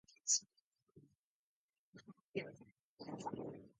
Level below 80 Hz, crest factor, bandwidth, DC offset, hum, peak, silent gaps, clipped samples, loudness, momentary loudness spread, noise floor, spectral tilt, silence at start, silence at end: -84 dBFS; 26 dB; 9.6 kHz; under 0.1%; none; -22 dBFS; 0.61-0.72 s, 0.82-0.87 s, 1.17-1.69 s, 1.78-1.93 s, 2.21-2.34 s, 2.79-2.97 s; under 0.1%; -41 LUFS; 26 LU; -83 dBFS; -2 dB/octave; 0.1 s; 0.1 s